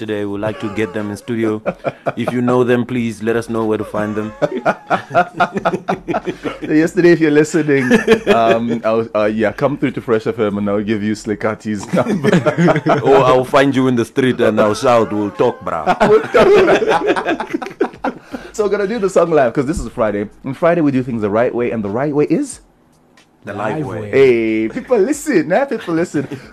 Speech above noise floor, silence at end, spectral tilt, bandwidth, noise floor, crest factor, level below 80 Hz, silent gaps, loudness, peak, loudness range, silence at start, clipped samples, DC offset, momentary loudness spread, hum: 36 dB; 0.05 s; -6.5 dB/octave; 13.5 kHz; -50 dBFS; 14 dB; -44 dBFS; none; -15 LUFS; -2 dBFS; 5 LU; 0 s; under 0.1%; under 0.1%; 10 LU; none